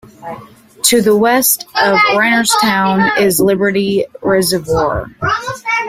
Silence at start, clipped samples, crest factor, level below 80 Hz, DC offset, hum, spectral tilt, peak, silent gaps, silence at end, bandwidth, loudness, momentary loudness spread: 0.2 s; under 0.1%; 14 dB; -42 dBFS; under 0.1%; none; -3.5 dB/octave; 0 dBFS; none; 0 s; 16 kHz; -12 LUFS; 8 LU